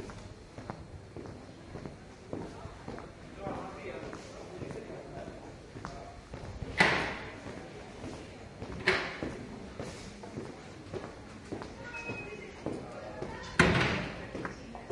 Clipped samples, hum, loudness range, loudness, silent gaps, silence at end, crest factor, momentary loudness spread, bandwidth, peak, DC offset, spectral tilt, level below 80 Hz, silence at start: under 0.1%; none; 11 LU; -36 LUFS; none; 0 s; 30 dB; 19 LU; 11.5 kHz; -8 dBFS; under 0.1%; -5 dB/octave; -54 dBFS; 0 s